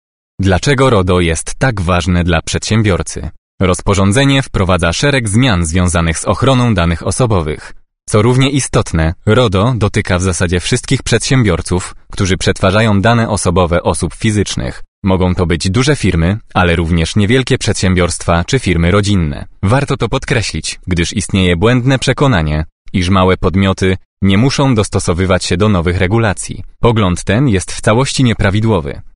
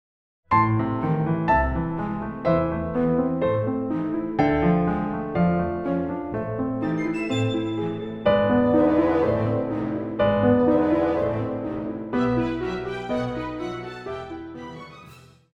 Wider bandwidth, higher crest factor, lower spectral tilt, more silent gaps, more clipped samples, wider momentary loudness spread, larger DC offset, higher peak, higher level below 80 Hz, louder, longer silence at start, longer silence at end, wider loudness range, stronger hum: first, 11 kHz vs 8.4 kHz; about the same, 12 dB vs 16 dB; second, -5.5 dB/octave vs -8.5 dB/octave; first, 3.38-3.58 s, 14.88-15.02 s, 22.72-22.85 s, 24.05-24.17 s vs none; neither; second, 6 LU vs 11 LU; first, 0.5% vs under 0.1%; first, 0 dBFS vs -8 dBFS; first, -28 dBFS vs -42 dBFS; first, -13 LUFS vs -24 LUFS; about the same, 0.4 s vs 0.5 s; second, 0.05 s vs 0.35 s; second, 1 LU vs 6 LU; neither